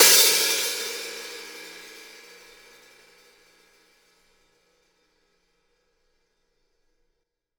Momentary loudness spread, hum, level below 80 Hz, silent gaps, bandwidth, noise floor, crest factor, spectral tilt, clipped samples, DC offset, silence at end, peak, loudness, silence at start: 29 LU; 60 Hz at -95 dBFS; -74 dBFS; none; over 20 kHz; -77 dBFS; 26 dB; 2 dB/octave; under 0.1%; under 0.1%; 5.6 s; -2 dBFS; -20 LUFS; 0 s